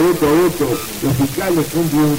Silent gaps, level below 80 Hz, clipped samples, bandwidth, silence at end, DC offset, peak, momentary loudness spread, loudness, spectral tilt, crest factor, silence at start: none; -40 dBFS; under 0.1%; over 20 kHz; 0 s; under 0.1%; -6 dBFS; 6 LU; -16 LUFS; -5.5 dB/octave; 10 dB; 0 s